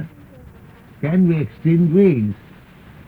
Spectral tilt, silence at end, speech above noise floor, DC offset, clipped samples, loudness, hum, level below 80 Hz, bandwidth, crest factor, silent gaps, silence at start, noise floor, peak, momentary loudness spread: -11 dB/octave; 0.75 s; 28 dB; under 0.1%; under 0.1%; -17 LUFS; none; -50 dBFS; 4.2 kHz; 14 dB; none; 0 s; -43 dBFS; -4 dBFS; 16 LU